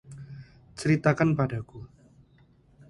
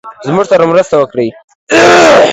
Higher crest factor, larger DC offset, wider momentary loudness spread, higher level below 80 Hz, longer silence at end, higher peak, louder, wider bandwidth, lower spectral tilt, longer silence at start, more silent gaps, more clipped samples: first, 24 dB vs 8 dB; neither; first, 23 LU vs 11 LU; second, -56 dBFS vs -44 dBFS; first, 1.05 s vs 0 s; second, -6 dBFS vs 0 dBFS; second, -26 LUFS vs -8 LUFS; second, 11.5 kHz vs 13 kHz; first, -7.5 dB/octave vs -4 dB/octave; about the same, 0.1 s vs 0.05 s; second, none vs 1.44-1.48 s, 1.55-1.67 s; second, under 0.1% vs 2%